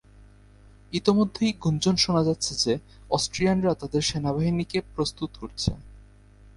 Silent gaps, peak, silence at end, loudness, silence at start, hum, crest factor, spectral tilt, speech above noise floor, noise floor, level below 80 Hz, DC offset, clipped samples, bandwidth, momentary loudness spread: none; -6 dBFS; 0.55 s; -25 LUFS; 0.9 s; none; 20 dB; -5 dB/octave; 27 dB; -52 dBFS; -46 dBFS; under 0.1%; under 0.1%; 11.5 kHz; 8 LU